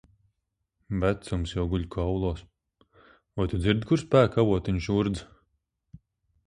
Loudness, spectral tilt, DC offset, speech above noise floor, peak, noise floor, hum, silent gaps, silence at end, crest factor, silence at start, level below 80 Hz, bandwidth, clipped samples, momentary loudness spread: -27 LUFS; -7.5 dB/octave; under 0.1%; 55 dB; -6 dBFS; -80 dBFS; none; none; 1.2 s; 22 dB; 0.9 s; -42 dBFS; 10.5 kHz; under 0.1%; 11 LU